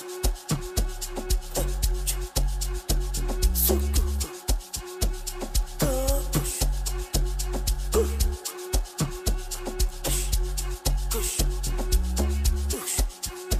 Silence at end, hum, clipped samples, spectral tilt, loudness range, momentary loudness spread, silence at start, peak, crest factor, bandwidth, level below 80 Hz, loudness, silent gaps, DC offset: 0 s; none; under 0.1%; -4 dB/octave; 2 LU; 5 LU; 0 s; -8 dBFS; 18 dB; 15.5 kHz; -28 dBFS; -28 LUFS; none; under 0.1%